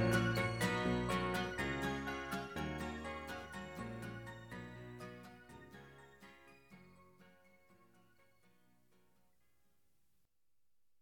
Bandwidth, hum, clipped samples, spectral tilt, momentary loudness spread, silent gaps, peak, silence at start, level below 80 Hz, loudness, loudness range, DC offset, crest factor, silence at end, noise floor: 18 kHz; none; under 0.1%; -5.5 dB/octave; 23 LU; none; -22 dBFS; 0 s; -60 dBFS; -41 LUFS; 23 LU; under 0.1%; 22 dB; 3.7 s; -88 dBFS